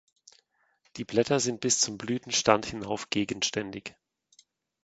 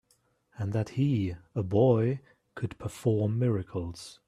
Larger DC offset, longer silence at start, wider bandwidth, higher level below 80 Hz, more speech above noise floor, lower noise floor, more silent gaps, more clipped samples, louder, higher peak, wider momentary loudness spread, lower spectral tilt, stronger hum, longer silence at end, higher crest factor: neither; first, 0.95 s vs 0.6 s; second, 9.2 kHz vs 12.5 kHz; about the same, -62 dBFS vs -58 dBFS; about the same, 42 dB vs 42 dB; about the same, -70 dBFS vs -70 dBFS; neither; neither; about the same, -28 LUFS vs -29 LUFS; first, -4 dBFS vs -10 dBFS; about the same, 16 LU vs 14 LU; second, -3 dB/octave vs -8.5 dB/octave; neither; first, 0.95 s vs 0.15 s; first, 28 dB vs 18 dB